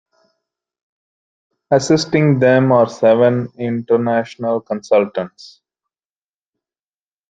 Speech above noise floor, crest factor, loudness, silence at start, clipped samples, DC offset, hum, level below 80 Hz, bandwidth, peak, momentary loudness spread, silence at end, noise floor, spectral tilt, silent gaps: over 75 dB; 16 dB; -15 LUFS; 1.7 s; under 0.1%; under 0.1%; none; -60 dBFS; 9.2 kHz; -2 dBFS; 10 LU; 1.8 s; under -90 dBFS; -6.5 dB/octave; none